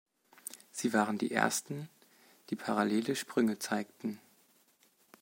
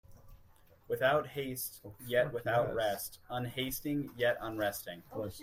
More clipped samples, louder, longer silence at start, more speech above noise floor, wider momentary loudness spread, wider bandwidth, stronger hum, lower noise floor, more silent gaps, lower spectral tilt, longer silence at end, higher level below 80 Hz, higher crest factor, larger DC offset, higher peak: neither; about the same, -34 LUFS vs -35 LUFS; first, 0.5 s vs 0.1 s; first, 36 dB vs 27 dB; first, 16 LU vs 11 LU; about the same, 16.5 kHz vs 16 kHz; neither; first, -69 dBFS vs -61 dBFS; neither; about the same, -4 dB/octave vs -4.5 dB/octave; first, 1.05 s vs 0 s; second, -82 dBFS vs -62 dBFS; first, 24 dB vs 18 dB; neither; first, -12 dBFS vs -18 dBFS